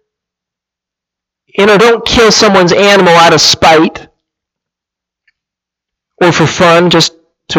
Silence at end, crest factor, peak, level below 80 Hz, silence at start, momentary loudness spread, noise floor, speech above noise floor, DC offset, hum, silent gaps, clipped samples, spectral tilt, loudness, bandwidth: 0 s; 10 dB; 0 dBFS; -38 dBFS; 1.55 s; 7 LU; -83 dBFS; 76 dB; under 0.1%; none; none; 0.3%; -3.5 dB/octave; -6 LUFS; 18 kHz